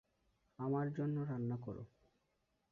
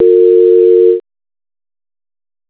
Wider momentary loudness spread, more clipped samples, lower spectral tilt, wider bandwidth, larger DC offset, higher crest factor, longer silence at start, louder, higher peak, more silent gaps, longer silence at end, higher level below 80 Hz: first, 12 LU vs 5 LU; neither; about the same, -10.5 dB/octave vs -10 dB/octave; second, 3.6 kHz vs 4 kHz; neither; about the same, 14 dB vs 10 dB; first, 0.6 s vs 0 s; second, -41 LUFS vs -8 LUFS; second, -28 dBFS vs 0 dBFS; neither; second, 0.85 s vs 1.5 s; second, -74 dBFS vs -68 dBFS